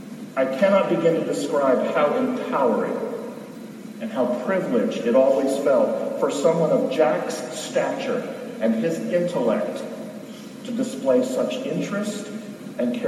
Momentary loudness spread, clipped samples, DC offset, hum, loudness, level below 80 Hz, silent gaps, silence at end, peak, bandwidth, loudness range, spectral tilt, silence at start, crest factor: 15 LU; under 0.1%; under 0.1%; none; -22 LUFS; -74 dBFS; none; 0 s; -4 dBFS; 14 kHz; 5 LU; -5.5 dB/octave; 0 s; 18 dB